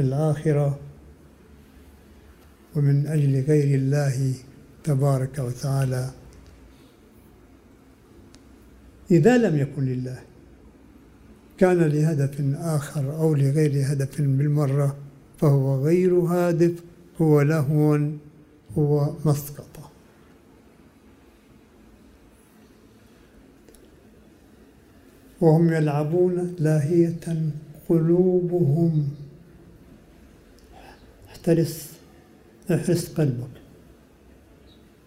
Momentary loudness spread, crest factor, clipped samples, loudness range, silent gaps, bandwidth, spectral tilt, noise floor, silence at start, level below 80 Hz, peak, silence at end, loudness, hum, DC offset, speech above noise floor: 14 LU; 20 dB; under 0.1%; 8 LU; none; 15.5 kHz; -8 dB/octave; -53 dBFS; 0 s; -54 dBFS; -4 dBFS; 1.5 s; -22 LUFS; none; under 0.1%; 32 dB